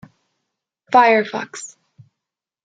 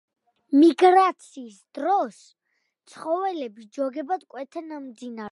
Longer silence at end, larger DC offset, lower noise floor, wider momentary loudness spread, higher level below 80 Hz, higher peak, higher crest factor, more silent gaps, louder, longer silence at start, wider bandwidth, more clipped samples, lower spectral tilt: first, 1 s vs 0 s; neither; first, -84 dBFS vs -75 dBFS; about the same, 21 LU vs 21 LU; first, -72 dBFS vs -86 dBFS; about the same, -2 dBFS vs -4 dBFS; about the same, 20 dB vs 20 dB; neither; first, -16 LUFS vs -22 LUFS; first, 0.9 s vs 0.5 s; second, 9.4 kHz vs 11.5 kHz; neither; about the same, -3.5 dB/octave vs -4.5 dB/octave